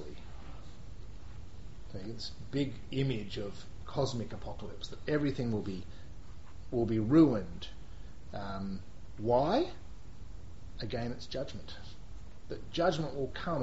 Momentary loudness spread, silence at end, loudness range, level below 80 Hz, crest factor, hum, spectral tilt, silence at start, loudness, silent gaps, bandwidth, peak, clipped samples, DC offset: 22 LU; 0 s; 8 LU; -50 dBFS; 22 dB; none; -6 dB/octave; 0 s; -34 LUFS; none; 8 kHz; -14 dBFS; under 0.1%; 0.8%